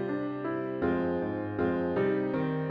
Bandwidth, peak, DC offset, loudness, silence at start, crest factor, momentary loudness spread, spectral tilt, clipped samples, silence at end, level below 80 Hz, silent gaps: 5.2 kHz; -16 dBFS; under 0.1%; -31 LUFS; 0 s; 14 dB; 5 LU; -10 dB/octave; under 0.1%; 0 s; -62 dBFS; none